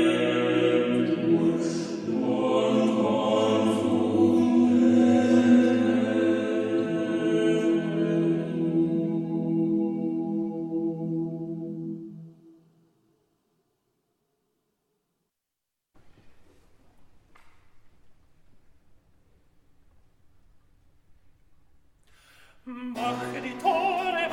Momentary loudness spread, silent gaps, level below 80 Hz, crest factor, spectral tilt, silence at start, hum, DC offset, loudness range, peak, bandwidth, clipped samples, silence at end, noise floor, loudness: 12 LU; none; -68 dBFS; 18 dB; -6.5 dB/octave; 0 s; none; under 0.1%; 16 LU; -10 dBFS; 10.5 kHz; under 0.1%; 0 s; -85 dBFS; -25 LUFS